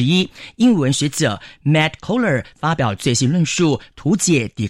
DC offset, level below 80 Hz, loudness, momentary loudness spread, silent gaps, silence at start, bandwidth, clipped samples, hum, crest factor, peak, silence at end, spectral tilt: under 0.1%; -48 dBFS; -18 LUFS; 5 LU; none; 0 s; 16 kHz; under 0.1%; none; 12 dB; -6 dBFS; 0 s; -5 dB/octave